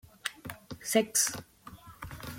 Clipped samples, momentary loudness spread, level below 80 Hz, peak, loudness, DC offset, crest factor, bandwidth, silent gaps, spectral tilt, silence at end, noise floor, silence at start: under 0.1%; 24 LU; -60 dBFS; -12 dBFS; -30 LUFS; under 0.1%; 24 dB; 17 kHz; none; -2 dB/octave; 0 s; -51 dBFS; 0.25 s